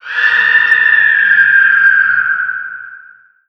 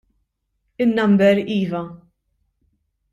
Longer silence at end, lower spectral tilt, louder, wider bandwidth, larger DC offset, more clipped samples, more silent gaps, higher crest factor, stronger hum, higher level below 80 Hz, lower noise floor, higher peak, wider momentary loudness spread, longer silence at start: second, 0.5 s vs 1.15 s; second, -1.5 dB/octave vs -8 dB/octave; first, -8 LUFS vs -18 LUFS; second, 6.6 kHz vs 7.8 kHz; neither; neither; neither; second, 10 dB vs 16 dB; neither; second, -70 dBFS vs -60 dBFS; second, -41 dBFS vs -72 dBFS; first, 0 dBFS vs -4 dBFS; about the same, 13 LU vs 13 LU; second, 0.05 s vs 0.8 s